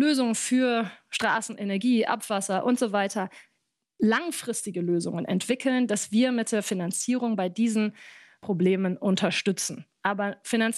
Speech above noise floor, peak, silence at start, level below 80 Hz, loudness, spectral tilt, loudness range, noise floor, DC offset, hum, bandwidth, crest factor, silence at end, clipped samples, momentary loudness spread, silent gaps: 51 dB; -10 dBFS; 0 s; -76 dBFS; -26 LUFS; -4.5 dB/octave; 2 LU; -77 dBFS; under 0.1%; none; 13 kHz; 16 dB; 0 s; under 0.1%; 7 LU; none